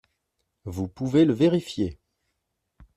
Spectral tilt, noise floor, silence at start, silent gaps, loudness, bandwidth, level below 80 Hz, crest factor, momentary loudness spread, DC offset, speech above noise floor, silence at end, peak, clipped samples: -7.5 dB/octave; -78 dBFS; 0.65 s; none; -24 LUFS; 13 kHz; -56 dBFS; 18 dB; 15 LU; under 0.1%; 56 dB; 1 s; -8 dBFS; under 0.1%